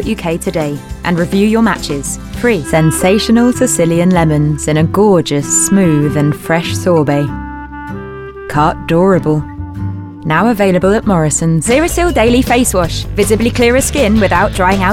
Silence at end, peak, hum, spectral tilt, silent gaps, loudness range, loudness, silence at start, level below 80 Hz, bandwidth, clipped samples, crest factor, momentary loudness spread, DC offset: 0 s; 0 dBFS; none; -5 dB/octave; none; 4 LU; -12 LUFS; 0 s; -28 dBFS; 16.5 kHz; under 0.1%; 12 dB; 11 LU; under 0.1%